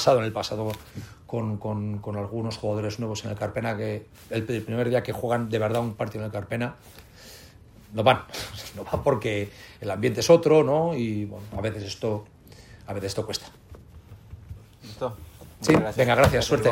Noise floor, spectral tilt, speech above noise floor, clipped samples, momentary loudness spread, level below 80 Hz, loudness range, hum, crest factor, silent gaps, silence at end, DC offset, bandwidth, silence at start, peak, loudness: -49 dBFS; -5.5 dB/octave; 24 dB; under 0.1%; 22 LU; -48 dBFS; 10 LU; none; 22 dB; none; 0 s; under 0.1%; 16 kHz; 0 s; -4 dBFS; -26 LUFS